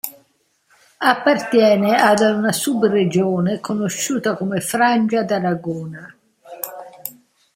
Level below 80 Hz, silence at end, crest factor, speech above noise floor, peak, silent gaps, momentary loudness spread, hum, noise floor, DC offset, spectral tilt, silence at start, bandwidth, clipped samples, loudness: -64 dBFS; 0.45 s; 18 dB; 45 dB; 0 dBFS; none; 16 LU; none; -62 dBFS; under 0.1%; -4.5 dB/octave; 0.05 s; 16.5 kHz; under 0.1%; -17 LUFS